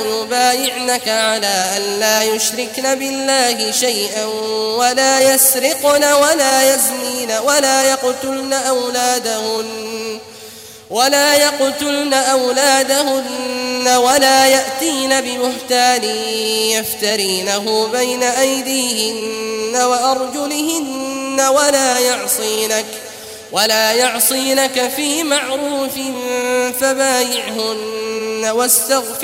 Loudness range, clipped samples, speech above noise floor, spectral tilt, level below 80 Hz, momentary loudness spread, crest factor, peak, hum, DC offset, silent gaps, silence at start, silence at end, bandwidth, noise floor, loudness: 4 LU; under 0.1%; 20 dB; -0.5 dB/octave; -60 dBFS; 9 LU; 16 dB; 0 dBFS; none; under 0.1%; none; 0 s; 0 s; 16.5 kHz; -36 dBFS; -14 LUFS